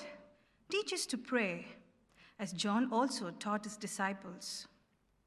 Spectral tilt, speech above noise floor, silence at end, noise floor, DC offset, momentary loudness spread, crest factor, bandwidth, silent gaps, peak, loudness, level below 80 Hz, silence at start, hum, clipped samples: -3.5 dB/octave; 37 dB; 0.6 s; -74 dBFS; under 0.1%; 12 LU; 20 dB; 14 kHz; none; -20 dBFS; -37 LUFS; -80 dBFS; 0 s; none; under 0.1%